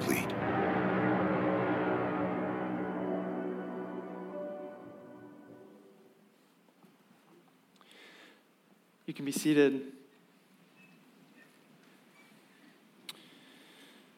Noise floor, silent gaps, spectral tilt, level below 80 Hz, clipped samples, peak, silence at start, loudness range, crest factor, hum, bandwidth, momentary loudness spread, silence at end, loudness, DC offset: -66 dBFS; none; -6 dB/octave; -72 dBFS; under 0.1%; -14 dBFS; 0 s; 23 LU; 22 dB; none; 16.5 kHz; 26 LU; 0.3 s; -33 LUFS; under 0.1%